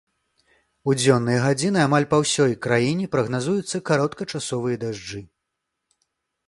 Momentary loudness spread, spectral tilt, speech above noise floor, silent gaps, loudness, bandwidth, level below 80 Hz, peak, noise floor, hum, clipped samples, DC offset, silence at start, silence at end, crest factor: 11 LU; -5 dB/octave; 59 dB; none; -22 LUFS; 11.5 kHz; -58 dBFS; -4 dBFS; -80 dBFS; none; under 0.1%; under 0.1%; 0.85 s; 1.25 s; 20 dB